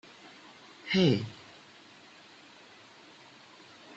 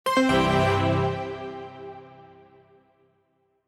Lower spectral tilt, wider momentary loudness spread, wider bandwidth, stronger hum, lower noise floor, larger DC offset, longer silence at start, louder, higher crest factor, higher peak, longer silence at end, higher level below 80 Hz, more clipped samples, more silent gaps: about the same, -6.5 dB/octave vs -6 dB/octave; first, 26 LU vs 21 LU; second, 8 kHz vs 15 kHz; neither; second, -55 dBFS vs -69 dBFS; neither; first, 0.25 s vs 0.05 s; second, -28 LUFS vs -23 LUFS; about the same, 22 dB vs 18 dB; second, -12 dBFS vs -8 dBFS; second, 0 s vs 1.4 s; second, -70 dBFS vs -48 dBFS; neither; neither